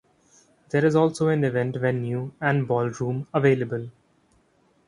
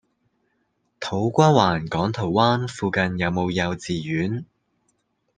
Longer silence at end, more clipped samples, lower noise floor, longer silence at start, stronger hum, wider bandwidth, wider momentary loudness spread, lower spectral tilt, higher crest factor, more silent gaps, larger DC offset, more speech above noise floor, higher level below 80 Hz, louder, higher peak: about the same, 0.95 s vs 0.95 s; neither; second, -63 dBFS vs -71 dBFS; second, 0.75 s vs 1 s; neither; first, 11 kHz vs 9.6 kHz; about the same, 9 LU vs 11 LU; first, -7.5 dB/octave vs -6 dB/octave; about the same, 18 dB vs 22 dB; neither; neither; second, 40 dB vs 49 dB; second, -62 dBFS vs -56 dBFS; about the same, -24 LUFS vs -22 LUFS; second, -6 dBFS vs -2 dBFS